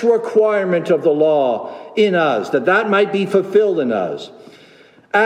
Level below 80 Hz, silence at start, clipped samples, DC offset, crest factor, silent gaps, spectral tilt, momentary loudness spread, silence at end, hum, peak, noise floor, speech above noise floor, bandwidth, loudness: -72 dBFS; 0 s; under 0.1%; under 0.1%; 14 dB; none; -6.5 dB/octave; 9 LU; 0 s; none; -2 dBFS; -47 dBFS; 31 dB; 10 kHz; -16 LUFS